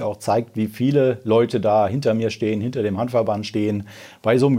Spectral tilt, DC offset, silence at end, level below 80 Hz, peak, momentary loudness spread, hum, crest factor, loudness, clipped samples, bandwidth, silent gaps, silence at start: -7 dB/octave; under 0.1%; 0 s; -64 dBFS; -4 dBFS; 6 LU; none; 16 dB; -21 LUFS; under 0.1%; 16 kHz; none; 0 s